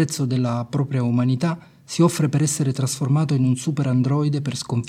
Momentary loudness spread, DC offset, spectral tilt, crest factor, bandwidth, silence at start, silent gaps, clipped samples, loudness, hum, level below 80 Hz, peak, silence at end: 5 LU; under 0.1%; -6 dB/octave; 16 dB; 15 kHz; 0 s; none; under 0.1%; -21 LUFS; none; -60 dBFS; -4 dBFS; 0 s